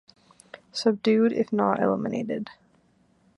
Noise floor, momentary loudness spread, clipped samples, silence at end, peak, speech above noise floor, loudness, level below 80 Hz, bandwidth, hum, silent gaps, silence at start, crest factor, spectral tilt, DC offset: -63 dBFS; 12 LU; under 0.1%; 0.85 s; -8 dBFS; 39 dB; -25 LUFS; -70 dBFS; 11 kHz; none; none; 0.55 s; 20 dB; -6 dB/octave; under 0.1%